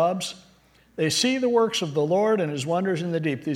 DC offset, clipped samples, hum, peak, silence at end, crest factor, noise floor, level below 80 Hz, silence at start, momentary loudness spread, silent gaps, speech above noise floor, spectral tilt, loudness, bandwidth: under 0.1%; under 0.1%; none; -10 dBFS; 0 s; 14 dB; -58 dBFS; -66 dBFS; 0 s; 9 LU; none; 34 dB; -4.5 dB/octave; -24 LUFS; 16.5 kHz